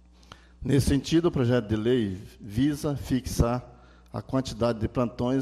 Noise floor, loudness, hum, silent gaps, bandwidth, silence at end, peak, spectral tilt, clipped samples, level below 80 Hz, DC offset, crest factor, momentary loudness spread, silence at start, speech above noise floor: -51 dBFS; -27 LUFS; none; none; 14.5 kHz; 0 s; -10 dBFS; -6.5 dB/octave; under 0.1%; -42 dBFS; under 0.1%; 16 dB; 10 LU; 0.6 s; 26 dB